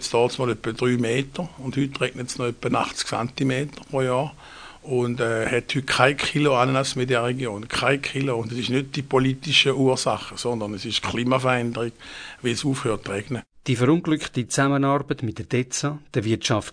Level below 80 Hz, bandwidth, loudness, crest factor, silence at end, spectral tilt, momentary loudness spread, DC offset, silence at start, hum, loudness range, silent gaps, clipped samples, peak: -52 dBFS; 10 kHz; -23 LUFS; 22 dB; 0 s; -4.5 dB/octave; 9 LU; under 0.1%; 0 s; none; 4 LU; none; under 0.1%; 0 dBFS